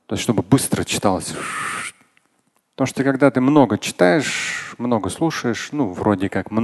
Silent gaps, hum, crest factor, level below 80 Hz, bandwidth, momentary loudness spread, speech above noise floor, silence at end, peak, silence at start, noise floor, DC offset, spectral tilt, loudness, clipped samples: none; none; 20 dB; -48 dBFS; 12.5 kHz; 9 LU; 46 dB; 0 s; 0 dBFS; 0.1 s; -65 dBFS; under 0.1%; -5 dB/octave; -19 LUFS; under 0.1%